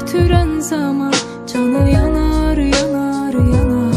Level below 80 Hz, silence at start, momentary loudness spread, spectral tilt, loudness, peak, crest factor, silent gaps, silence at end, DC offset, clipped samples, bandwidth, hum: -22 dBFS; 0 s; 5 LU; -6 dB/octave; -15 LUFS; -2 dBFS; 12 dB; none; 0 s; under 0.1%; under 0.1%; 15 kHz; none